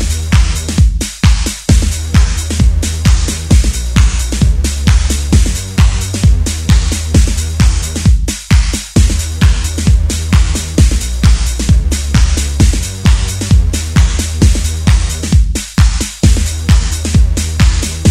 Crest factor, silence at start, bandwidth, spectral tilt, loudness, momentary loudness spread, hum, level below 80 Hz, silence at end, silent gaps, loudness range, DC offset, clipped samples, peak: 10 dB; 0 s; 15 kHz; -4.5 dB/octave; -12 LUFS; 2 LU; none; -12 dBFS; 0 s; none; 0 LU; 0.4%; 0.3%; 0 dBFS